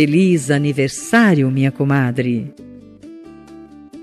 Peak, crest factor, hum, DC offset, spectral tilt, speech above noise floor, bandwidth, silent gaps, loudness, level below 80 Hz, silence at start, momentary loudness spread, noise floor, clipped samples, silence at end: -2 dBFS; 14 dB; none; under 0.1%; -6.5 dB/octave; 24 dB; 13 kHz; none; -16 LUFS; -58 dBFS; 0 s; 10 LU; -39 dBFS; under 0.1%; 0 s